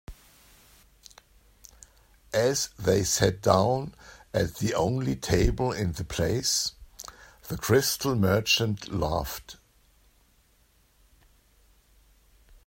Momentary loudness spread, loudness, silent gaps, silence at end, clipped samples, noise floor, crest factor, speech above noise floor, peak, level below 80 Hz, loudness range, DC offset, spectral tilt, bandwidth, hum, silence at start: 16 LU; -26 LUFS; none; 3.15 s; under 0.1%; -64 dBFS; 24 dB; 38 dB; -6 dBFS; -44 dBFS; 5 LU; under 0.1%; -4 dB/octave; 16.5 kHz; none; 0.1 s